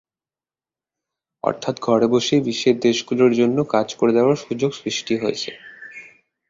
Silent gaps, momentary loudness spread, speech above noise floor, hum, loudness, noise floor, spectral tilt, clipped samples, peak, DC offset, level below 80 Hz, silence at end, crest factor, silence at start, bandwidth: none; 15 LU; over 71 dB; none; -19 LUFS; under -90 dBFS; -5 dB/octave; under 0.1%; -2 dBFS; under 0.1%; -62 dBFS; 0.45 s; 18 dB; 1.45 s; 7.8 kHz